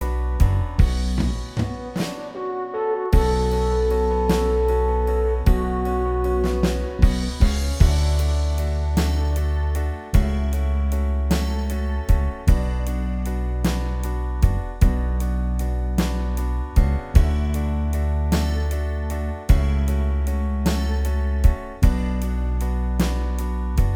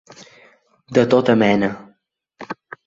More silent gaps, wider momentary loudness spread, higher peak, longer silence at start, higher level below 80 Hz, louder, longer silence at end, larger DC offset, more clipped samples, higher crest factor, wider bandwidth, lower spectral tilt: neither; second, 6 LU vs 19 LU; about the same, 0 dBFS vs -2 dBFS; second, 0 s vs 0.2 s; first, -22 dBFS vs -58 dBFS; second, -23 LUFS vs -17 LUFS; second, 0 s vs 0.35 s; neither; neither; about the same, 18 dB vs 18 dB; first, 16.5 kHz vs 7.6 kHz; about the same, -7 dB/octave vs -6.5 dB/octave